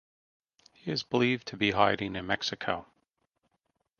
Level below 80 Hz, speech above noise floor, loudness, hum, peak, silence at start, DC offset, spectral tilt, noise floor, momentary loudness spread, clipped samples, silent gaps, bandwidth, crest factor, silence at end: -60 dBFS; 49 dB; -29 LUFS; none; -8 dBFS; 0.85 s; under 0.1%; -5 dB/octave; -79 dBFS; 9 LU; under 0.1%; none; 7 kHz; 24 dB; 1.15 s